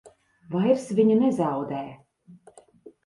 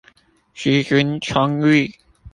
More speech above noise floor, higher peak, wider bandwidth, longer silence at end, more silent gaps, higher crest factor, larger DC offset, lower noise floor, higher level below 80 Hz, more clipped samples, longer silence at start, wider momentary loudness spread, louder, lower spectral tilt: second, 31 dB vs 38 dB; second, -8 dBFS vs -2 dBFS; first, 11.5 kHz vs 10 kHz; about the same, 0.15 s vs 0.05 s; neither; about the same, 18 dB vs 18 dB; neither; about the same, -54 dBFS vs -55 dBFS; second, -68 dBFS vs -50 dBFS; neither; second, 0.05 s vs 0.55 s; first, 13 LU vs 6 LU; second, -24 LUFS vs -18 LUFS; first, -8 dB/octave vs -6 dB/octave